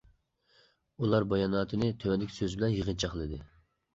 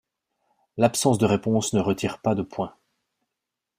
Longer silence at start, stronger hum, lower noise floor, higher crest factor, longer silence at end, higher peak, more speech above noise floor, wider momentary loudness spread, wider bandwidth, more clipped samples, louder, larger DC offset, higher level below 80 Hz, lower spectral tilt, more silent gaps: first, 1 s vs 0.75 s; neither; second, -68 dBFS vs -85 dBFS; about the same, 20 dB vs 20 dB; second, 0.5 s vs 1.1 s; second, -14 dBFS vs -4 dBFS; second, 38 dB vs 62 dB; second, 8 LU vs 12 LU; second, 8 kHz vs 15.5 kHz; neither; second, -31 LUFS vs -24 LUFS; neither; first, -50 dBFS vs -58 dBFS; about the same, -6.5 dB/octave vs -5.5 dB/octave; neither